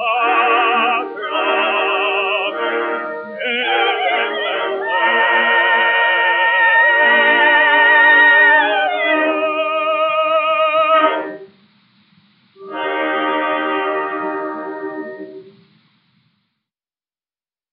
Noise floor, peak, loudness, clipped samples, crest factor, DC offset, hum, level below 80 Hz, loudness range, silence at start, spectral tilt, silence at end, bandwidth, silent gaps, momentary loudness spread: under -90 dBFS; 0 dBFS; -14 LUFS; under 0.1%; 16 dB; under 0.1%; none; -88 dBFS; 12 LU; 0 s; 2.5 dB/octave; 2.25 s; 4.7 kHz; none; 14 LU